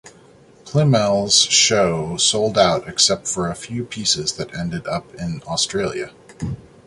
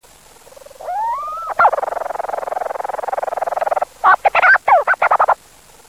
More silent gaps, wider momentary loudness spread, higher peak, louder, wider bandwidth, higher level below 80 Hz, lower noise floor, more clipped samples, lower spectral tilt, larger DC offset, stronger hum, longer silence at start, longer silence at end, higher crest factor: neither; first, 16 LU vs 12 LU; about the same, -2 dBFS vs -2 dBFS; about the same, -18 LUFS vs -16 LUFS; second, 11.5 kHz vs 16 kHz; first, -48 dBFS vs -56 dBFS; about the same, -48 dBFS vs -46 dBFS; neither; about the same, -3 dB/octave vs -2 dB/octave; second, under 0.1% vs 0.2%; neither; second, 0.05 s vs 0.8 s; second, 0.3 s vs 0.55 s; about the same, 18 dB vs 14 dB